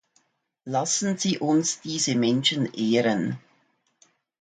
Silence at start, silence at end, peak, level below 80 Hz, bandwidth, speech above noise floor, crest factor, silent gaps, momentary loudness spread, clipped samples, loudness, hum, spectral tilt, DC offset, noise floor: 0.65 s; 1.05 s; -10 dBFS; -70 dBFS; 9.6 kHz; 44 dB; 16 dB; none; 8 LU; under 0.1%; -24 LUFS; none; -3.5 dB/octave; under 0.1%; -68 dBFS